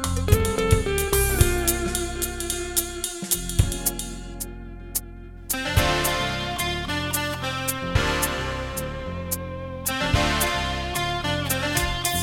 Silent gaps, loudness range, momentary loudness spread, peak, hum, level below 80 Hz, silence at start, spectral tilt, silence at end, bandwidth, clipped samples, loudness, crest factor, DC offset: none; 3 LU; 9 LU; -4 dBFS; none; -32 dBFS; 0 s; -3.5 dB/octave; 0 s; 17.5 kHz; under 0.1%; -24 LUFS; 22 dB; under 0.1%